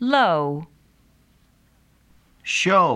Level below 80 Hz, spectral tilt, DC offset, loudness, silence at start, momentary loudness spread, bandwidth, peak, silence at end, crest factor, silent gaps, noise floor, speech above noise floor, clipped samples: -62 dBFS; -4 dB/octave; under 0.1%; -20 LUFS; 0 s; 18 LU; 12.5 kHz; -4 dBFS; 0 s; 18 dB; none; -59 dBFS; 40 dB; under 0.1%